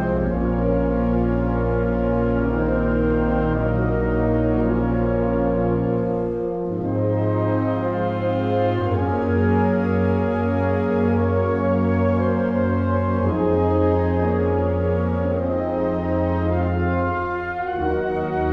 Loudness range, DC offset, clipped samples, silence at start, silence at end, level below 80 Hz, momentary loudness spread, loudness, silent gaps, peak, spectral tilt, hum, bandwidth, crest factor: 2 LU; under 0.1%; under 0.1%; 0 s; 0 s; -32 dBFS; 3 LU; -21 LUFS; none; -8 dBFS; -10.5 dB/octave; none; 5.4 kHz; 12 dB